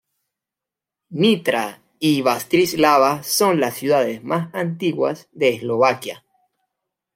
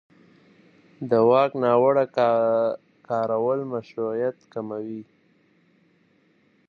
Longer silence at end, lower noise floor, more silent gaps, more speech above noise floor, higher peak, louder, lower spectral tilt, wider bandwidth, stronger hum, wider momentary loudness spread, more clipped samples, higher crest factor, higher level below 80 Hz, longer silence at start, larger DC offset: second, 1 s vs 1.65 s; first, -87 dBFS vs -62 dBFS; neither; first, 68 dB vs 40 dB; first, -2 dBFS vs -6 dBFS; first, -19 LUFS vs -23 LUFS; second, -4.5 dB/octave vs -8.5 dB/octave; first, 16.5 kHz vs 6.4 kHz; neither; second, 9 LU vs 16 LU; neither; about the same, 18 dB vs 18 dB; first, -64 dBFS vs -76 dBFS; about the same, 1.1 s vs 1 s; neither